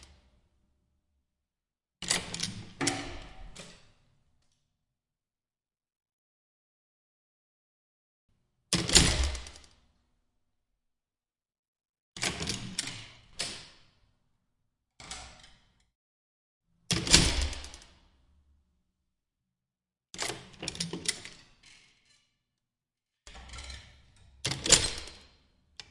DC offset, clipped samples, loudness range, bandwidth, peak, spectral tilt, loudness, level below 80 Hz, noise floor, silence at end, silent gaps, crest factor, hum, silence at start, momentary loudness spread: under 0.1%; under 0.1%; 14 LU; 11.5 kHz; -2 dBFS; -2 dB/octave; -28 LUFS; -46 dBFS; under -90 dBFS; 0.7 s; 6.13-8.29 s, 11.59-11.73 s, 11.89-11.94 s, 12.00-12.12 s, 15.95-16.61 s; 34 dB; none; 0 s; 27 LU